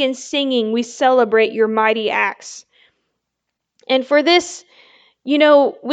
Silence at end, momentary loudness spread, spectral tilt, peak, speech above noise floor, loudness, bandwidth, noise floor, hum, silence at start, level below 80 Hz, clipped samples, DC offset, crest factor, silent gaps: 0 s; 18 LU; -3 dB/octave; 0 dBFS; 62 dB; -16 LUFS; 9.2 kHz; -78 dBFS; none; 0 s; -70 dBFS; under 0.1%; under 0.1%; 16 dB; none